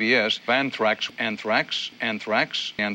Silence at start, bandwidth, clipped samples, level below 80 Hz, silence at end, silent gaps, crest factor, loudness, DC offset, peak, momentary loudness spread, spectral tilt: 0 s; 16 kHz; under 0.1%; -72 dBFS; 0 s; none; 18 dB; -24 LUFS; under 0.1%; -6 dBFS; 6 LU; -3.5 dB/octave